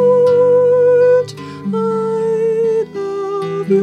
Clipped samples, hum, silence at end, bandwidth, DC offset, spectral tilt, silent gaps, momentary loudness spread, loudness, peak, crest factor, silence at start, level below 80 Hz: under 0.1%; none; 0 s; 9 kHz; under 0.1%; -7.5 dB/octave; none; 11 LU; -14 LUFS; -4 dBFS; 10 dB; 0 s; -62 dBFS